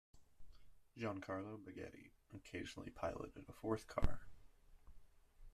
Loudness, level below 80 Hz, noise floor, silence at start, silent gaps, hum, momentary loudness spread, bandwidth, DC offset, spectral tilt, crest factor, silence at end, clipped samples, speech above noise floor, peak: -48 LUFS; -54 dBFS; -64 dBFS; 0.15 s; none; none; 15 LU; 13 kHz; under 0.1%; -6.5 dB/octave; 24 dB; 0 s; under 0.1%; 21 dB; -20 dBFS